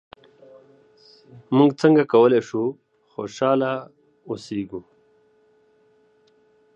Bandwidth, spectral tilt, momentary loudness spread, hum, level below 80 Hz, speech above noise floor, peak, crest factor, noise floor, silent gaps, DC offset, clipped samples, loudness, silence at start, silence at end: 8.4 kHz; -7 dB/octave; 18 LU; none; -68 dBFS; 40 dB; -2 dBFS; 20 dB; -60 dBFS; none; under 0.1%; under 0.1%; -20 LUFS; 1.5 s; 1.95 s